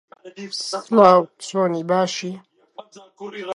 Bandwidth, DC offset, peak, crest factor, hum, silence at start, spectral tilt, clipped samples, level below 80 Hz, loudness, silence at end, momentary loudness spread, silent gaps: 11.5 kHz; under 0.1%; 0 dBFS; 20 dB; none; 0.25 s; -5 dB/octave; under 0.1%; -70 dBFS; -19 LUFS; 0 s; 23 LU; none